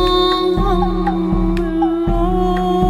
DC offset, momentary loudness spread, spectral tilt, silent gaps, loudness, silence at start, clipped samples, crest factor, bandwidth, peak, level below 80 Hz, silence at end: under 0.1%; 3 LU; -7.5 dB/octave; none; -17 LUFS; 0 s; under 0.1%; 12 dB; 13.5 kHz; -4 dBFS; -22 dBFS; 0 s